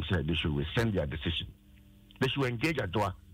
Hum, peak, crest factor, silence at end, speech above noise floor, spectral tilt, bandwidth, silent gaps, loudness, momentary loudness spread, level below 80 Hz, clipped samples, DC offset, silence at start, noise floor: none; -16 dBFS; 16 dB; 0 s; 26 dB; -6 dB/octave; 16 kHz; none; -31 LUFS; 4 LU; -46 dBFS; under 0.1%; under 0.1%; 0 s; -57 dBFS